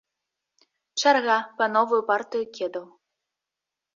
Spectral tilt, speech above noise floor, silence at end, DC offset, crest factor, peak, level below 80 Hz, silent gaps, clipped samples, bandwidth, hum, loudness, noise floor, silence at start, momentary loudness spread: -2 dB/octave; 64 dB; 1.1 s; under 0.1%; 20 dB; -6 dBFS; -78 dBFS; none; under 0.1%; 7.4 kHz; none; -24 LUFS; -87 dBFS; 0.95 s; 12 LU